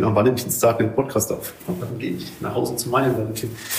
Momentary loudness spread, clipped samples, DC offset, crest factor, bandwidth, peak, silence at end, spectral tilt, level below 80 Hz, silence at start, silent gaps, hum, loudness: 10 LU; under 0.1%; under 0.1%; 16 dB; 15.5 kHz; -6 dBFS; 0 s; -5 dB/octave; -52 dBFS; 0 s; none; none; -22 LUFS